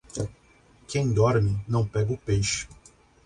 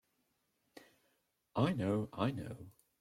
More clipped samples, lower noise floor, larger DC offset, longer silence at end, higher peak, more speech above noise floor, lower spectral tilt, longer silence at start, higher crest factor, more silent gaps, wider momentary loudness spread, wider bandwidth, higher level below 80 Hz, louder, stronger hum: neither; second, -57 dBFS vs -81 dBFS; neither; first, 0.5 s vs 0.3 s; first, -10 dBFS vs -18 dBFS; second, 33 dB vs 44 dB; second, -5.5 dB/octave vs -7.5 dB/octave; second, 0.15 s vs 0.75 s; second, 16 dB vs 22 dB; neither; second, 12 LU vs 17 LU; second, 10.5 kHz vs 15.5 kHz; first, -46 dBFS vs -70 dBFS; first, -26 LUFS vs -37 LUFS; neither